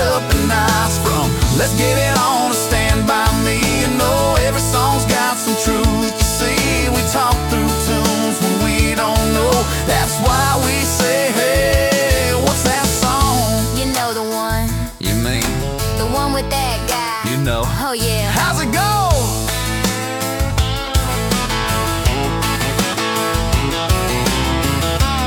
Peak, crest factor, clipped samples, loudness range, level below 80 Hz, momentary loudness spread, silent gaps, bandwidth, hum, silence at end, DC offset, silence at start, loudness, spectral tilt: -2 dBFS; 14 dB; under 0.1%; 3 LU; -24 dBFS; 4 LU; none; 17.5 kHz; none; 0 s; under 0.1%; 0 s; -16 LUFS; -4 dB/octave